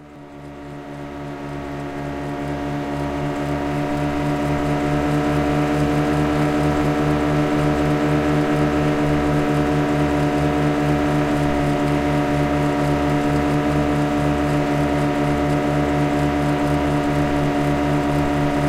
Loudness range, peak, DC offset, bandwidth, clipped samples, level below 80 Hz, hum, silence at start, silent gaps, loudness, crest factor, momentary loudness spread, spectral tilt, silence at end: 5 LU; -6 dBFS; under 0.1%; 15 kHz; under 0.1%; -34 dBFS; none; 0 s; none; -20 LUFS; 12 dB; 9 LU; -7 dB/octave; 0 s